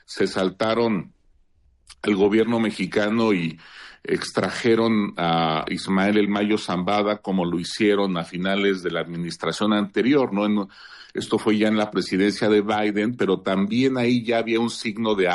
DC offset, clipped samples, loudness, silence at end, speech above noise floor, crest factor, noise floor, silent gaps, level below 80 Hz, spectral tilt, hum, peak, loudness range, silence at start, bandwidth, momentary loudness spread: under 0.1%; under 0.1%; -22 LUFS; 0 s; 38 dB; 14 dB; -59 dBFS; none; -60 dBFS; -6 dB/octave; none; -8 dBFS; 2 LU; 0.1 s; 11.5 kHz; 7 LU